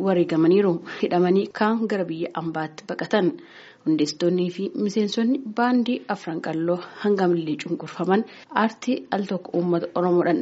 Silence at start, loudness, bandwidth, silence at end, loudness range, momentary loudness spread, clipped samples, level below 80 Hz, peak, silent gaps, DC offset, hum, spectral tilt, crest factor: 0 s; -23 LUFS; 8 kHz; 0 s; 2 LU; 8 LU; under 0.1%; -72 dBFS; -4 dBFS; none; under 0.1%; none; -5.5 dB/octave; 18 dB